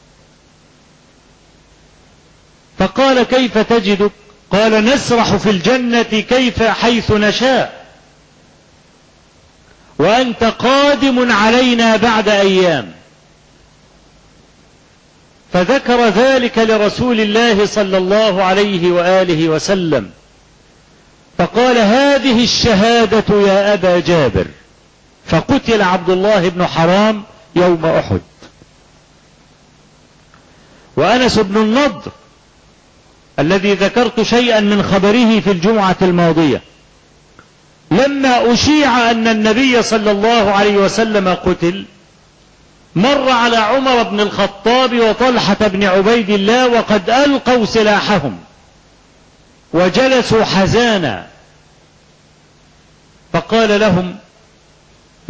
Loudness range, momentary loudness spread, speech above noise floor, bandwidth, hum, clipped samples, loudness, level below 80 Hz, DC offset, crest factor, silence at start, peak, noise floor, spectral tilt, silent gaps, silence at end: 7 LU; 7 LU; 36 dB; 8 kHz; none; under 0.1%; -12 LUFS; -40 dBFS; under 0.1%; 12 dB; 2.8 s; -2 dBFS; -47 dBFS; -5 dB/octave; none; 1.15 s